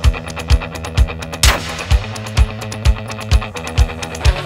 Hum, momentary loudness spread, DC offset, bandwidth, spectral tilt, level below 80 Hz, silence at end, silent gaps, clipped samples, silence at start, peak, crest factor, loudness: none; 7 LU; under 0.1%; 16 kHz; -4 dB/octave; -18 dBFS; 0 s; none; under 0.1%; 0 s; 0 dBFS; 16 dB; -18 LUFS